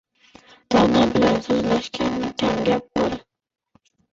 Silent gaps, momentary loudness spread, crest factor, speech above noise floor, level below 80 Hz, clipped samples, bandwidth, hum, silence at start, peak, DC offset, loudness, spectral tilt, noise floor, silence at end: none; 7 LU; 16 dB; 43 dB; -46 dBFS; under 0.1%; 7.8 kHz; none; 0.7 s; -6 dBFS; under 0.1%; -20 LUFS; -5.5 dB/octave; -62 dBFS; 0.9 s